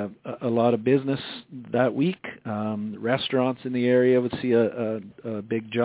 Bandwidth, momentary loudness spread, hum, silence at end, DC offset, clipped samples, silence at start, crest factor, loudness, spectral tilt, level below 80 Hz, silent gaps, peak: 4 kHz; 13 LU; none; 0 s; under 0.1%; under 0.1%; 0 s; 18 dB; -25 LUFS; -11 dB/octave; -64 dBFS; none; -6 dBFS